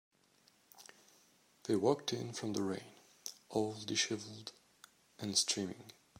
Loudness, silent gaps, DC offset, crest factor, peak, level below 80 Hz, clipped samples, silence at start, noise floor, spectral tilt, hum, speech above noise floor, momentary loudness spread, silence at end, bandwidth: -37 LUFS; none; under 0.1%; 22 dB; -18 dBFS; -82 dBFS; under 0.1%; 0.75 s; -71 dBFS; -3 dB/octave; none; 33 dB; 22 LU; 0.3 s; 16 kHz